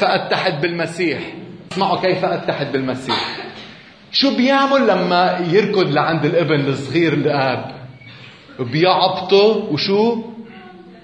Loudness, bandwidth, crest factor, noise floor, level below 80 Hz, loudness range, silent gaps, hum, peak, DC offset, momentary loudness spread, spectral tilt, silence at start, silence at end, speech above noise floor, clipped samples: -17 LUFS; 10 kHz; 16 dB; -40 dBFS; -60 dBFS; 4 LU; none; none; -2 dBFS; under 0.1%; 19 LU; -6 dB/octave; 0 s; 0.05 s; 24 dB; under 0.1%